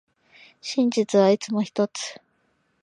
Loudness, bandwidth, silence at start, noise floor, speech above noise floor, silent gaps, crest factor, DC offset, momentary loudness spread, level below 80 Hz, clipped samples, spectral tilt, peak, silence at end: -23 LUFS; 10.5 kHz; 0.65 s; -69 dBFS; 46 dB; none; 18 dB; under 0.1%; 14 LU; -78 dBFS; under 0.1%; -5 dB/octave; -6 dBFS; 0.7 s